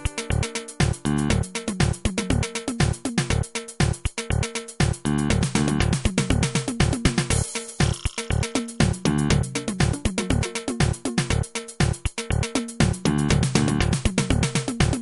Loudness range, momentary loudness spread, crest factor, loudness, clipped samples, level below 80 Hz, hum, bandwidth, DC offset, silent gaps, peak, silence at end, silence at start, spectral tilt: 2 LU; 5 LU; 20 dB; -24 LUFS; under 0.1%; -32 dBFS; none; 11.5 kHz; under 0.1%; none; -4 dBFS; 0 s; 0 s; -5 dB/octave